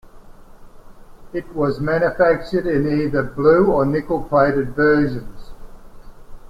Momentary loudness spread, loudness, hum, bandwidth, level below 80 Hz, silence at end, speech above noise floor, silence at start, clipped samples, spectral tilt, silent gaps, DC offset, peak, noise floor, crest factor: 9 LU; -18 LUFS; none; 13 kHz; -38 dBFS; 0.1 s; 23 dB; 0.15 s; under 0.1%; -8.5 dB/octave; none; under 0.1%; -2 dBFS; -40 dBFS; 16 dB